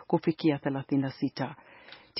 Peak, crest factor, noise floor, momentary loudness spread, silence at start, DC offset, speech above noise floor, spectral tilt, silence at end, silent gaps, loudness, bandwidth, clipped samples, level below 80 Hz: -12 dBFS; 20 dB; -52 dBFS; 22 LU; 0 s; under 0.1%; 22 dB; -6 dB/octave; 0 s; none; -30 LUFS; 5.8 kHz; under 0.1%; -72 dBFS